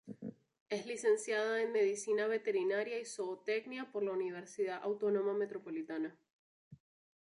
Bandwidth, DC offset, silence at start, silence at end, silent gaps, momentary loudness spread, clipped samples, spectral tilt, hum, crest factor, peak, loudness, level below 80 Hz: 11.5 kHz; under 0.1%; 0.05 s; 0.65 s; 0.61-0.66 s, 6.33-6.71 s; 9 LU; under 0.1%; -4 dB/octave; none; 16 dB; -22 dBFS; -37 LUFS; -88 dBFS